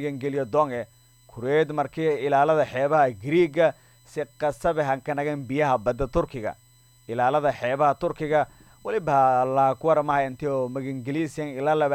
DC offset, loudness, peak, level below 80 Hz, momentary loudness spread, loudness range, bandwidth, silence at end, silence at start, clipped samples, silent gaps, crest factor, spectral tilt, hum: under 0.1%; -24 LUFS; -8 dBFS; -50 dBFS; 11 LU; 3 LU; 16.5 kHz; 0 s; 0 s; under 0.1%; none; 16 dB; -7 dB/octave; none